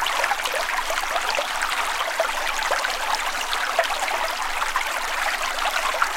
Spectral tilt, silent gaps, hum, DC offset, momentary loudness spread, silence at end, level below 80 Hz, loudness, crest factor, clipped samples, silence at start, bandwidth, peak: 1 dB/octave; none; none; under 0.1%; 2 LU; 0 s; -42 dBFS; -23 LUFS; 18 dB; under 0.1%; 0 s; 17 kHz; -4 dBFS